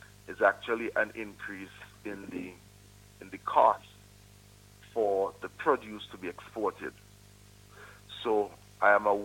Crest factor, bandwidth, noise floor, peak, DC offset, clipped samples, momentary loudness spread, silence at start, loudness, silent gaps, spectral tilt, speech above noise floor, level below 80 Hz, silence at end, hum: 24 dB; 17.5 kHz; -56 dBFS; -10 dBFS; under 0.1%; under 0.1%; 21 LU; 0.3 s; -31 LUFS; none; -5 dB/octave; 26 dB; -64 dBFS; 0 s; 50 Hz at -60 dBFS